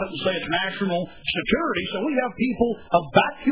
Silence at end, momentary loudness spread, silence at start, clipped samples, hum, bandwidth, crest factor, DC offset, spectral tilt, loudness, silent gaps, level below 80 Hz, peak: 0 s; 6 LU; 0 s; under 0.1%; none; 4 kHz; 22 dB; 0.4%; -9.5 dB/octave; -23 LUFS; none; -50 dBFS; -2 dBFS